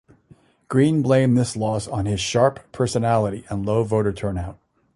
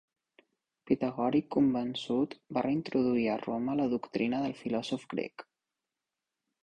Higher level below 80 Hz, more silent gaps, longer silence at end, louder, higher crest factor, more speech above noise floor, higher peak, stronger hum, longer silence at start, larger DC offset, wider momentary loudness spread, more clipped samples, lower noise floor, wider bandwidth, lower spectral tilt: first, -44 dBFS vs -68 dBFS; neither; second, 0.4 s vs 1.25 s; first, -21 LUFS vs -32 LUFS; about the same, 18 dB vs 20 dB; second, 34 dB vs 58 dB; first, -2 dBFS vs -14 dBFS; neither; second, 0.7 s vs 0.85 s; neither; first, 10 LU vs 7 LU; neither; second, -54 dBFS vs -89 dBFS; first, 11.5 kHz vs 9.4 kHz; about the same, -6.5 dB/octave vs -7 dB/octave